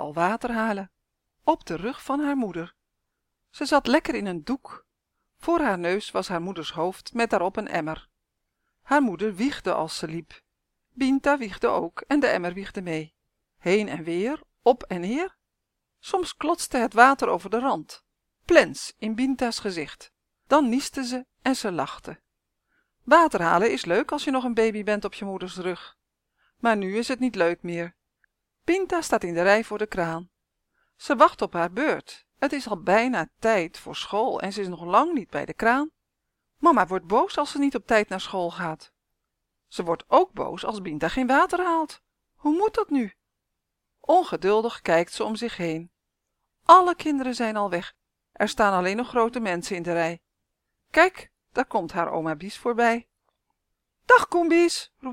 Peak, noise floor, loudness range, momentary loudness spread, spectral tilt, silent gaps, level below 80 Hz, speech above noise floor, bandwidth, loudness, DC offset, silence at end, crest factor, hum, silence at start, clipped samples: 0 dBFS; -81 dBFS; 5 LU; 13 LU; -4.5 dB/octave; none; -56 dBFS; 58 dB; 16.5 kHz; -24 LUFS; under 0.1%; 0 s; 24 dB; none; 0 s; under 0.1%